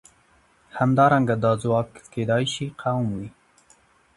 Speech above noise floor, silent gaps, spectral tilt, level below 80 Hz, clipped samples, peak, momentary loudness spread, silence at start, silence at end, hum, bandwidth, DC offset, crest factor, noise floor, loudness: 38 dB; none; -6.5 dB/octave; -56 dBFS; under 0.1%; -4 dBFS; 15 LU; 0.75 s; 0.85 s; none; 11.5 kHz; under 0.1%; 20 dB; -60 dBFS; -23 LUFS